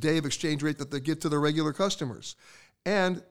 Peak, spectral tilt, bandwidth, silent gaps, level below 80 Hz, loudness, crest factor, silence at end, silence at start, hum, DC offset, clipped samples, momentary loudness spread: -12 dBFS; -5 dB/octave; 16 kHz; none; -62 dBFS; -29 LUFS; 16 dB; 0 s; 0 s; none; 0.3%; under 0.1%; 11 LU